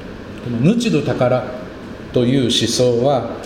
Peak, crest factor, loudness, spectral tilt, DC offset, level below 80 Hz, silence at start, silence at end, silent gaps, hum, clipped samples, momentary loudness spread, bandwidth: -2 dBFS; 16 dB; -16 LUFS; -5.5 dB/octave; under 0.1%; -44 dBFS; 0 s; 0 s; none; none; under 0.1%; 16 LU; 16 kHz